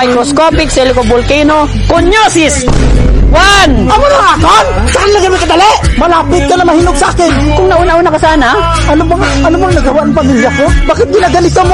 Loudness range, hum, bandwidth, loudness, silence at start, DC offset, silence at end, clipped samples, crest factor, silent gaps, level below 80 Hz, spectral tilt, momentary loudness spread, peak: 2 LU; none; 11.5 kHz; -7 LUFS; 0 s; 0.6%; 0 s; 0.6%; 6 dB; none; -14 dBFS; -4.5 dB/octave; 3 LU; 0 dBFS